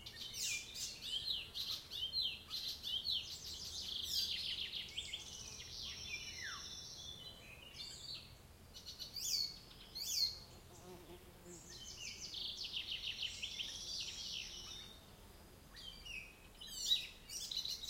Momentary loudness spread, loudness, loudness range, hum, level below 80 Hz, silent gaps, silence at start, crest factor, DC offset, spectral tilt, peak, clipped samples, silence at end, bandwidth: 18 LU; -42 LUFS; 7 LU; none; -66 dBFS; none; 0 s; 24 dB; under 0.1%; 0 dB/octave; -22 dBFS; under 0.1%; 0 s; 16.5 kHz